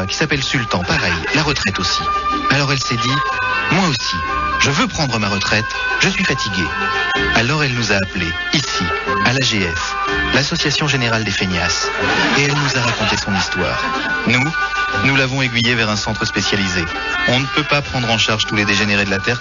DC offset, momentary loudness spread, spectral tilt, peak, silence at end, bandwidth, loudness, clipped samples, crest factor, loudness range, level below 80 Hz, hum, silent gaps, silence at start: under 0.1%; 4 LU; -2.5 dB/octave; 0 dBFS; 0 s; 7.4 kHz; -16 LUFS; under 0.1%; 16 dB; 1 LU; -36 dBFS; none; none; 0 s